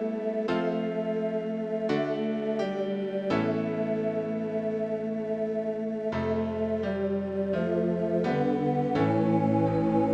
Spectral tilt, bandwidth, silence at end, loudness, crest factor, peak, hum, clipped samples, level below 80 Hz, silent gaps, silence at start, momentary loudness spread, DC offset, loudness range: -8.5 dB/octave; 8 kHz; 0 s; -28 LUFS; 16 dB; -12 dBFS; none; under 0.1%; -62 dBFS; none; 0 s; 6 LU; under 0.1%; 3 LU